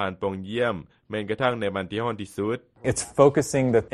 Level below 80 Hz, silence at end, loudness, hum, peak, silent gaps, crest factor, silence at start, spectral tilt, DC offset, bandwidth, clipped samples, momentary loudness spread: -52 dBFS; 0.05 s; -25 LUFS; none; -4 dBFS; none; 22 dB; 0 s; -5.5 dB/octave; under 0.1%; 13 kHz; under 0.1%; 11 LU